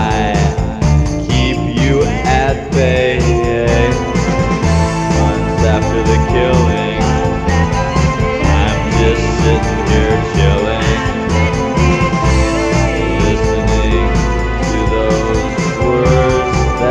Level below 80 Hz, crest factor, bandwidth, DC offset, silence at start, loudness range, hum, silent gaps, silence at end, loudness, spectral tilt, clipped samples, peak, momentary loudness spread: -18 dBFS; 12 dB; 10.5 kHz; under 0.1%; 0 s; 1 LU; none; none; 0 s; -13 LUFS; -6 dB/octave; under 0.1%; 0 dBFS; 3 LU